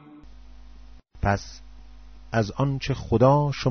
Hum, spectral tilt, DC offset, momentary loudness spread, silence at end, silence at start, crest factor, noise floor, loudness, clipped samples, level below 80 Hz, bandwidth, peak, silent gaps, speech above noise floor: none; -6.5 dB/octave; 0.4%; 10 LU; 0 s; 0.05 s; 20 dB; -47 dBFS; -24 LUFS; under 0.1%; -42 dBFS; 6.6 kHz; -6 dBFS; none; 25 dB